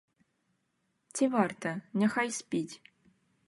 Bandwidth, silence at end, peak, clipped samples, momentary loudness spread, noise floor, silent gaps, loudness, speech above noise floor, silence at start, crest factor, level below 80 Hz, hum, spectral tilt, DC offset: 11.5 kHz; 0.7 s; -12 dBFS; under 0.1%; 13 LU; -78 dBFS; none; -31 LUFS; 47 dB; 1.15 s; 22 dB; -80 dBFS; none; -5 dB/octave; under 0.1%